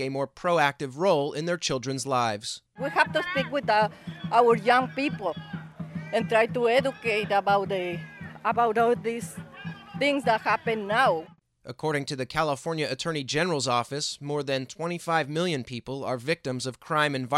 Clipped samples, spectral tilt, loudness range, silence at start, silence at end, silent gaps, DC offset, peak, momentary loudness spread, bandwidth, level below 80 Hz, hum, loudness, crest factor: under 0.1%; -4.5 dB/octave; 3 LU; 0 s; 0 s; none; under 0.1%; -6 dBFS; 11 LU; 13.5 kHz; -64 dBFS; none; -26 LUFS; 20 dB